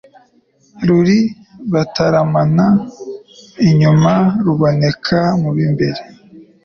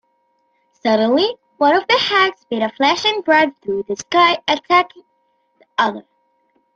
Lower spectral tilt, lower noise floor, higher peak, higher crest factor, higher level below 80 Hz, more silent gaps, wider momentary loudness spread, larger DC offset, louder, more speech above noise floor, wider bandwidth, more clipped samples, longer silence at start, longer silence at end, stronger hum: first, -7.5 dB/octave vs -3 dB/octave; second, -54 dBFS vs -64 dBFS; about the same, -2 dBFS vs -2 dBFS; about the same, 12 dB vs 16 dB; first, -46 dBFS vs -62 dBFS; neither; first, 15 LU vs 10 LU; neither; about the same, -14 LUFS vs -16 LUFS; second, 42 dB vs 48 dB; second, 6.8 kHz vs 8 kHz; neither; about the same, 0.75 s vs 0.85 s; second, 0.25 s vs 0.75 s; neither